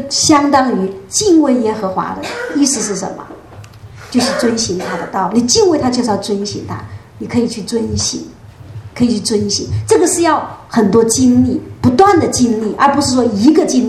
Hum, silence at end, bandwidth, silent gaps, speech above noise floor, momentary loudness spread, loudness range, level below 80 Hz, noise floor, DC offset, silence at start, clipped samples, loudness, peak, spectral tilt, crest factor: none; 0 s; 13 kHz; none; 22 dB; 12 LU; 6 LU; -42 dBFS; -35 dBFS; under 0.1%; 0 s; under 0.1%; -13 LUFS; 0 dBFS; -4 dB/octave; 14 dB